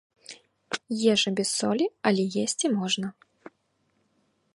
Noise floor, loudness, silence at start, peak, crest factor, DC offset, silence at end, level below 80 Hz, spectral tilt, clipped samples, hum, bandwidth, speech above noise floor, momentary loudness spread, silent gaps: -72 dBFS; -26 LUFS; 0.3 s; -8 dBFS; 20 dB; under 0.1%; 1.45 s; -74 dBFS; -3.5 dB/octave; under 0.1%; none; 11.5 kHz; 46 dB; 15 LU; none